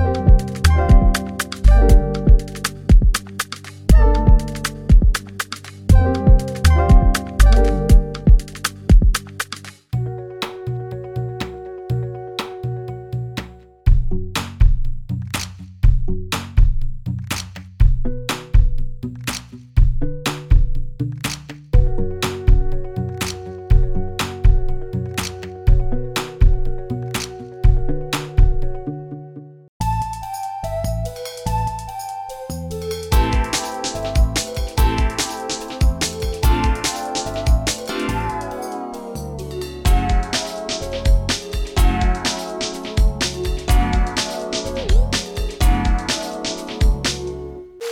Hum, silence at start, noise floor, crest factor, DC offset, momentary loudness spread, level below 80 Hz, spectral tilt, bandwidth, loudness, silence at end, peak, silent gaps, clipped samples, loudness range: none; 0 s; -37 dBFS; 16 dB; under 0.1%; 13 LU; -18 dBFS; -5 dB/octave; 16 kHz; -20 LUFS; 0 s; 0 dBFS; 29.69-29.80 s; under 0.1%; 8 LU